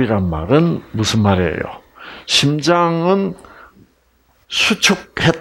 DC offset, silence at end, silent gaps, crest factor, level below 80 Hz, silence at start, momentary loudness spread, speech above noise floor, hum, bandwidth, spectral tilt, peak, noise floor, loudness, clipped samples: under 0.1%; 0 s; none; 16 dB; -44 dBFS; 0 s; 15 LU; 41 dB; none; 16 kHz; -4.5 dB/octave; 0 dBFS; -57 dBFS; -16 LUFS; under 0.1%